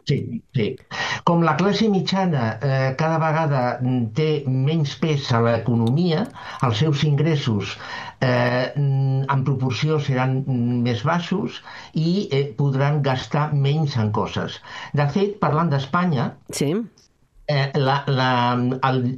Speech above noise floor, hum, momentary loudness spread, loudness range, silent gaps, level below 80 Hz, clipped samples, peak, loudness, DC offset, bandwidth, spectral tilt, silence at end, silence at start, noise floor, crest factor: 33 dB; none; 7 LU; 2 LU; none; -56 dBFS; under 0.1%; -4 dBFS; -21 LUFS; under 0.1%; 11 kHz; -7 dB/octave; 0 s; 0.05 s; -54 dBFS; 18 dB